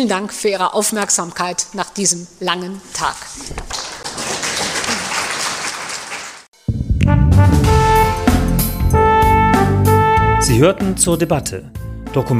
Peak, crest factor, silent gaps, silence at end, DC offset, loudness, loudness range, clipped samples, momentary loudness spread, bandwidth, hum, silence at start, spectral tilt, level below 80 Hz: 0 dBFS; 14 dB; 6.48-6.52 s; 0 s; under 0.1%; -16 LUFS; 8 LU; under 0.1%; 13 LU; 15.5 kHz; none; 0 s; -4.5 dB/octave; -26 dBFS